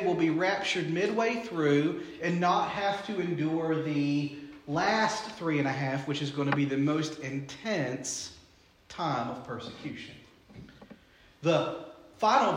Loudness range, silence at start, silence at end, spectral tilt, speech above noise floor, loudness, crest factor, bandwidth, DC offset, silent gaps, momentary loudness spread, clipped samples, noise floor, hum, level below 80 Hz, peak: 7 LU; 0 s; 0 s; -5 dB/octave; 31 dB; -30 LUFS; 18 dB; 11 kHz; under 0.1%; none; 13 LU; under 0.1%; -60 dBFS; none; -68 dBFS; -12 dBFS